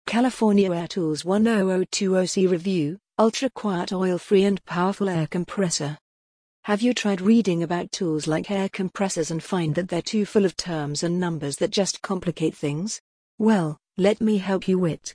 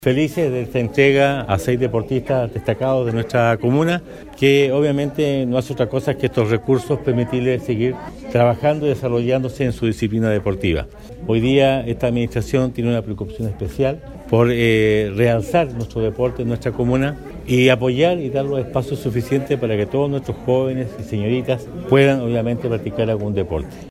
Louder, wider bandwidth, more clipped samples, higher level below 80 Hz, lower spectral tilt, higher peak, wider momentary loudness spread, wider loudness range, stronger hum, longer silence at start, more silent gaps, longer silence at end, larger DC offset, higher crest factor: second, -23 LUFS vs -19 LUFS; second, 10.5 kHz vs 15 kHz; neither; second, -60 dBFS vs -40 dBFS; second, -5.5 dB/octave vs -7 dB/octave; second, -6 dBFS vs 0 dBFS; about the same, 7 LU vs 8 LU; about the same, 3 LU vs 2 LU; neither; about the same, 0.05 s vs 0 s; first, 6.01-6.63 s, 13.00-13.38 s vs none; about the same, 0 s vs 0 s; neither; about the same, 16 dB vs 18 dB